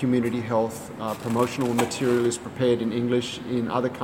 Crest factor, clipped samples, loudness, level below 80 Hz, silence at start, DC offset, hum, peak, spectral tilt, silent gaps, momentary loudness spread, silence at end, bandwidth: 16 dB; under 0.1%; -25 LUFS; -60 dBFS; 0 s; under 0.1%; none; -8 dBFS; -5.5 dB/octave; none; 6 LU; 0 s; 17 kHz